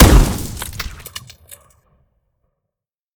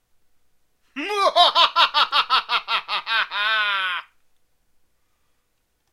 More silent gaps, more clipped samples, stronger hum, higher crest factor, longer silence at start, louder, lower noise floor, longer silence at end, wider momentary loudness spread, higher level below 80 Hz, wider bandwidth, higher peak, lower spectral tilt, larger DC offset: neither; first, 0.2% vs under 0.1%; neither; about the same, 18 dB vs 22 dB; second, 0 s vs 0.95 s; about the same, -18 LUFS vs -19 LUFS; first, -83 dBFS vs -69 dBFS; first, 2.2 s vs 1.9 s; first, 27 LU vs 11 LU; first, -20 dBFS vs -68 dBFS; first, over 20 kHz vs 15 kHz; about the same, 0 dBFS vs -2 dBFS; first, -5 dB/octave vs 0.5 dB/octave; neither